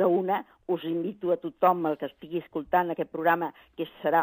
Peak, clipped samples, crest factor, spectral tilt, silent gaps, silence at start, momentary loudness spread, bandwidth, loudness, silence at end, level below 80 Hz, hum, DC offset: -8 dBFS; under 0.1%; 18 dB; -9 dB/octave; none; 0 s; 11 LU; 15.5 kHz; -28 LUFS; 0 s; -68 dBFS; none; under 0.1%